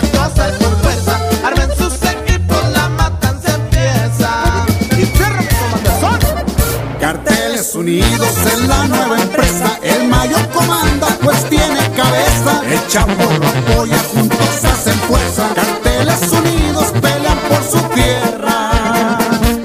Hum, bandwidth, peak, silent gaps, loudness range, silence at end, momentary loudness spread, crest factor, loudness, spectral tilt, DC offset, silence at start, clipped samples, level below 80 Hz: none; 15.5 kHz; 0 dBFS; none; 2 LU; 0 s; 3 LU; 12 dB; -13 LUFS; -4.5 dB/octave; under 0.1%; 0 s; under 0.1%; -20 dBFS